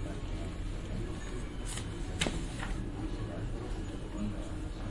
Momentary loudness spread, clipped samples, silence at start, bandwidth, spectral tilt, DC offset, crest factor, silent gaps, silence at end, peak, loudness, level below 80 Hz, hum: 7 LU; under 0.1%; 0 s; 11.5 kHz; -5 dB/octave; under 0.1%; 22 dB; none; 0 s; -14 dBFS; -39 LUFS; -40 dBFS; none